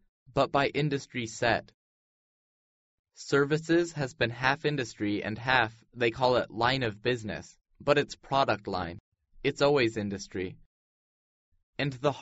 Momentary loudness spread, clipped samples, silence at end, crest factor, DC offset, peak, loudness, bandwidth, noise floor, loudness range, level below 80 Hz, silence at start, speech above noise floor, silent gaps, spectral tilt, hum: 10 LU; under 0.1%; 0 s; 22 dB; under 0.1%; -8 dBFS; -29 LUFS; 8 kHz; under -90 dBFS; 4 LU; -58 dBFS; 0.3 s; over 61 dB; 1.74-3.04 s, 9.00-9.12 s, 10.66-11.52 s, 11.63-11.73 s; -3.5 dB/octave; none